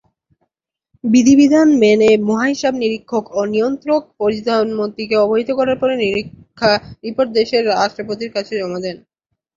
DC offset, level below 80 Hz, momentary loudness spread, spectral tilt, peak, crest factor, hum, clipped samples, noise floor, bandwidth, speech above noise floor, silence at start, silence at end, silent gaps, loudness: under 0.1%; -54 dBFS; 12 LU; -5 dB/octave; 0 dBFS; 14 dB; none; under 0.1%; -77 dBFS; 7.6 kHz; 62 dB; 1.05 s; 0.6 s; none; -16 LUFS